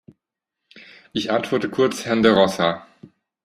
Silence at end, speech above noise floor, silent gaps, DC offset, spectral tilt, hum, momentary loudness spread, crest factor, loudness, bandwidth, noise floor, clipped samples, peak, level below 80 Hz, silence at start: 0.4 s; 63 dB; none; under 0.1%; -5 dB/octave; none; 12 LU; 20 dB; -20 LUFS; 14.5 kHz; -83 dBFS; under 0.1%; -2 dBFS; -60 dBFS; 0.75 s